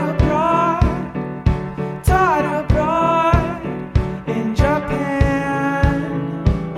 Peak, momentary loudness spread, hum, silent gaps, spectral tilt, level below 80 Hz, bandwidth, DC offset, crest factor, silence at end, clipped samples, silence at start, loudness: -2 dBFS; 8 LU; none; none; -7.5 dB/octave; -24 dBFS; 14 kHz; under 0.1%; 16 dB; 0 s; under 0.1%; 0 s; -18 LUFS